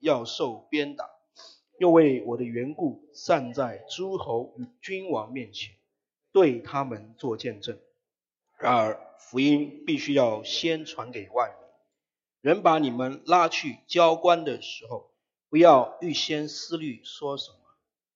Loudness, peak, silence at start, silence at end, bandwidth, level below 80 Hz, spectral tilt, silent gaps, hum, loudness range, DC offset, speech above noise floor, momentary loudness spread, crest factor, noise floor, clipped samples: -25 LUFS; -4 dBFS; 0.05 s; 0.7 s; 7.6 kHz; -76 dBFS; -5 dB/octave; none; none; 7 LU; under 0.1%; 64 dB; 17 LU; 22 dB; -89 dBFS; under 0.1%